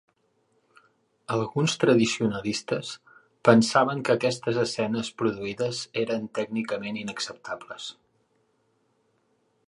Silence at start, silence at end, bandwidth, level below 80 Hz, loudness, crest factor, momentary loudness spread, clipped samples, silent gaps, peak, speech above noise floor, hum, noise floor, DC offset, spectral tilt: 1.3 s; 1.75 s; 11.5 kHz; -66 dBFS; -26 LUFS; 24 dB; 16 LU; under 0.1%; none; -4 dBFS; 44 dB; none; -70 dBFS; under 0.1%; -5 dB/octave